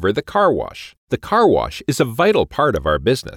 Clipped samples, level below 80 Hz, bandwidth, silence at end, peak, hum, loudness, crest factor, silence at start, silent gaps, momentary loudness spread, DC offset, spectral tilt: under 0.1%; -38 dBFS; 17 kHz; 0 s; -4 dBFS; none; -17 LUFS; 14 dB; 0 s; 0.97-1.07 s; 11 LU; under 0.1%; -5.5 dB/octave